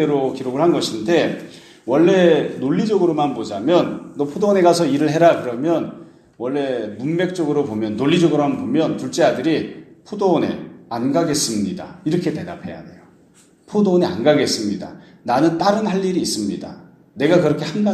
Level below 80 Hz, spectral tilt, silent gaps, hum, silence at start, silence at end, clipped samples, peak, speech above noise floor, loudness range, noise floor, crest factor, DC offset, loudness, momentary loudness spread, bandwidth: -60 dBFS; -5.5 dB/octave; none; none; 0 s; 0 s; under 0.1%; 0 dBFS; 34 dB; 4 LU; -52 dBFS; 18 dB; under 0.1%; -18 LUFS; 14 LU; 13.5 kHz